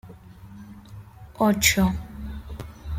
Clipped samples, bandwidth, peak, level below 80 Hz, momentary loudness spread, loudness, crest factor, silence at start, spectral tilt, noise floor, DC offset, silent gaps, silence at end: under 0.1%; 16.5 kHz; -4 dBFS; -40 dBFS; 26 LU; -21 LUFS; 24 dB; 0.05 s; -3.5 dB/octave; -44 dBFS; under 0.1%; none; 0 s